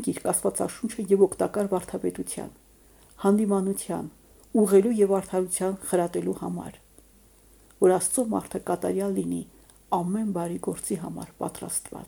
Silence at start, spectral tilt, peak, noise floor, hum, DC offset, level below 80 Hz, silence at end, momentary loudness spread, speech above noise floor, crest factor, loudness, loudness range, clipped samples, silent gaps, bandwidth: 0 s; -5.5 dB/octave; -8 dBFS; -56 dBFS; none; under 0.1%; -58 dBFS; 0 s; 13 LU; 30 dB; 20 dB; -26 LUFS; 4 LU; under 0.1%; none; over 20 kHz